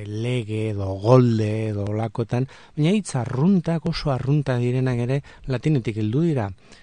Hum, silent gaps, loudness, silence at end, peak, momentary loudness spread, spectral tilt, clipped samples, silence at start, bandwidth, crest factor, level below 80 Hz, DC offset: none; none; -23 LUFS; 0.1 s; -2 dBFS; 9 LU; -7.5 dB/octave; under 0.1%; 0 s; 10 kHz; 20 dB; -48 dBFS; 0.2%